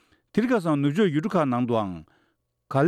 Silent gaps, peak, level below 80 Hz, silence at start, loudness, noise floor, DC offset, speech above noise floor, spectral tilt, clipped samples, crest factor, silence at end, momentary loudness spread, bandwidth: none; -10 dBFS; -64 dBFS; 0.35 s; -24 LUFS; -71 dBFS; under 0.1%; 48 dB; -8 dB/octave; under 0.1%; 14 dB; 0 s; 7 LU; 13 kHz